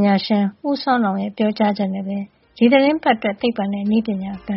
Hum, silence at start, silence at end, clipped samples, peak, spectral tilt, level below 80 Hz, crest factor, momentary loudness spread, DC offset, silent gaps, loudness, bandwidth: none; 0 s; 0 s; under 0.1%; -2 dBFS; -5 dB/octave; -58 dBFS; 16 dB; 10 LU; under 0.1%; none; -19 LUFS; 5.8 kHz